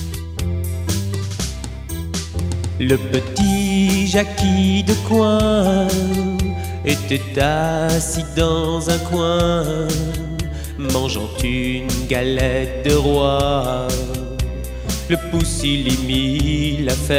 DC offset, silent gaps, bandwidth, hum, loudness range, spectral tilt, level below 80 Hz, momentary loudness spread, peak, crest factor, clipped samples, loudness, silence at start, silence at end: under 0.1%; none; 16.5 kHz; none; 4 LU; -5 dB/octave; -28 dBFS; 9 LU; -2 dBFS; 16 dB; under 0.1%; -19 LUFS; 0 s; 0 s